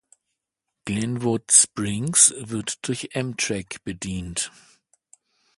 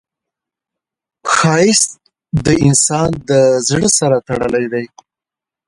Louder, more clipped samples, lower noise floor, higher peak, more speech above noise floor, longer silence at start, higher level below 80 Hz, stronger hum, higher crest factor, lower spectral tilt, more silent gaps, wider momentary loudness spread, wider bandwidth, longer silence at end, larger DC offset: second, -21 LUFS vs -13 LUFS; neither; second, -83 dBFS vs -87 dBFS; about the same, 0 dBFS vs 0 dBFS; second, 59 dB vs 74 dB; second, 0.85 s vs 1.25 s; second, -52 dBFS vs -42 dBFS; neither; first, 26 dB vs 16 dB; second, -2.5 dB/octave vs -4 dB/octave; neither; first, 16 LU vs 11 LU; about the same, 12 kHz vs 11.5 kHz; first, 1.1 s vs 0.8 s; neither